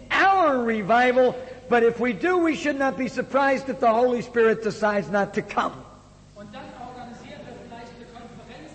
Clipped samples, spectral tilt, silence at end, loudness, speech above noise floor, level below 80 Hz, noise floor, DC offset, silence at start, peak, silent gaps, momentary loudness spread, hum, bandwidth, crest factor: under 0.1%; -5.5 dB/octave; 0 s; -22 LUFS; 26 dB; -56 dBFS; -48 dBFS; under 0.1%; 0 s; -10 dBFS; none; 22 LU; none; 8.6 kHz; 14 dB